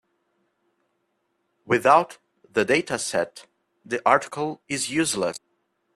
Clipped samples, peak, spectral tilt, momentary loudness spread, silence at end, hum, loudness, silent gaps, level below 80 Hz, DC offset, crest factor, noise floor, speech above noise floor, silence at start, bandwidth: under 0.1%; -4 dBFS; -3.5 dB/octave; 13 LU; 0.6 s; none; -23 LUFS; none; -66 dBFS; under 0.1%; 22 dB; -74 dBFS; 51 dB; 1.65 s; 14 kHz